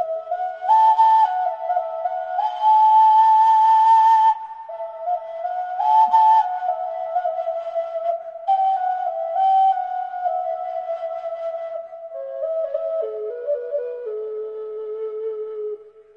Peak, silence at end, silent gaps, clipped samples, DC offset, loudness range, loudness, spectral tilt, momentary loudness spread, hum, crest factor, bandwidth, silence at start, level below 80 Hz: -6 dBFS; 0.3 s; none; under 0.1%; under 0.1%; 11 LU; -19 LUFS; -2 dB/octave; 16 LU; none; 14 dB; 6.8 kHz; 0 s; -74 dBFS